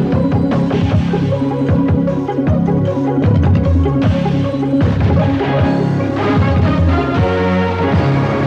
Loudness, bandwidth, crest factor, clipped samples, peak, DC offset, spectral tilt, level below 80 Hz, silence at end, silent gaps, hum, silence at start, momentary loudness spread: -14 LUFS; 7.4 kHz; 12 dB; under 0.1%; -2 dBFS; under 0.1%; -9 dB/octave; -28 dBFS; 0 s; none; none; 0 s; 3 LU